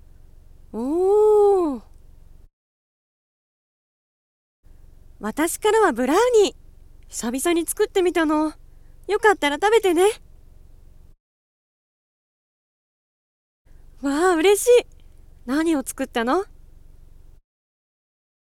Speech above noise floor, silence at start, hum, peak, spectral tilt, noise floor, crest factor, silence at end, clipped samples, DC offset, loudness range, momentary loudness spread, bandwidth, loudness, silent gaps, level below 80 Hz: 27 dB; 0.75 s; none; -4 dBFS; -3 dB/octave; -46 dBFS; 18 dB; 2 s; under 0.1%; under 0.1%; 7 LU; 14 LU; 16.5 kHz; -20 LUFS; 2.53-4.63 s, 11.20-13.65 s; -48 dBFS